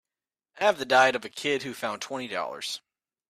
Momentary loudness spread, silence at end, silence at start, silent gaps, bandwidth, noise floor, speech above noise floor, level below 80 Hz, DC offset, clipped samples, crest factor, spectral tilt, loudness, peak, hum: 13 LU; 0.5 s; 0.55 s; none; 15 kHz; under -90 dBFS; over 63 dB; -74 dBFS; under 0.1%; under 0.1%; 20 dB; -2.5 dB/octave; -27 LUFS; -8 dBFS; none